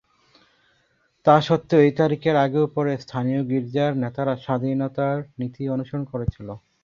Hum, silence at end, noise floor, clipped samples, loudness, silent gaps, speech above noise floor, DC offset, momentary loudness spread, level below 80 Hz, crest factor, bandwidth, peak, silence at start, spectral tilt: none; 0.25 s; -66 dBFS; under 0.1%; -22 LUFS; none; 44 dB; under 0.1%; 11 LU; -50 dBFS; 20 dB; 7.2 kHz; -2 dBFS; 1.25 s; -8 dB/octave